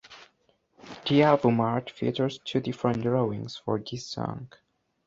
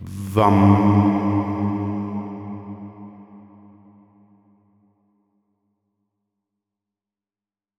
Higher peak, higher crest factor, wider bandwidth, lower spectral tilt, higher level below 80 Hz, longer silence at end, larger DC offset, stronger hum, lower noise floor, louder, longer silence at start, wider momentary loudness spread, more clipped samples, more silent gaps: about the same, -6 dBFS vs -4 dBFS; about the same, 22 dB vs 20 dB; second, 7.8 kHz vs 12.5 kHz; second, -7 dB/octave vs -9 dB/octave; second, -62 dBFS vs -56 dBFS; second, 0.6 s vs 4.4 s; neither; neither; second, -69 dBFS vs under -90 dBFS; second, -27 LUFS vs -19 LUFS; about the same, 0.1 s vs 0 s; second, 14 LU vs 23 LU; neither; neither